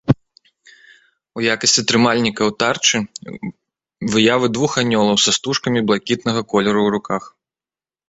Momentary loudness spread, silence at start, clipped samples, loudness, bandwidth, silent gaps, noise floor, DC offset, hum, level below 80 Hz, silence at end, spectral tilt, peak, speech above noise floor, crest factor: 14 LU; 0.05 s; under 0.1%; -17 LUFS; 8.2 kHz; none; under -90 dBFS; under 0.1%; none; -52 dBFS; 0.8 s; -3.5 dB/octave; -2 dBFS; over 73 dB; 18 dB